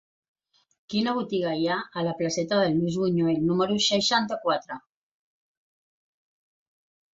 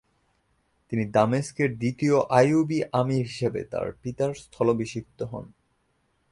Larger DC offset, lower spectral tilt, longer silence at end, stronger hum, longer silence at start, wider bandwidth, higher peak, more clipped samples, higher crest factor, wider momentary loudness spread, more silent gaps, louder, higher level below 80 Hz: neither; second, -4.5 dB/octave vs -7 dB/octave; first, 2.4 s vs 0.9 s; neither; about the same, 0.9 s vs 0.9 s; second, 8 kHz vs 11.5 kHz; second, -10 dBFS vs -6 dBFS; neither; about the same, 18 dB vs 20 dB; second, 7 LU vs 14 LU; neither; about the same, -25 LUFS vs -25 LUFS; second, -66 dBFS vs -58 dBFS